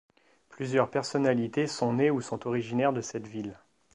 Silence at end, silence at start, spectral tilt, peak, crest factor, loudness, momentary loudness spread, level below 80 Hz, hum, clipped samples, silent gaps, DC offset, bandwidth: 0.4 s; 0.5 s; -6 dB/octave; -10 dBFS; 20 dB; -29 LUFS; 12 LU; -70 dBFS; none; under 0.1%; none; under 0.1%; 11 kHz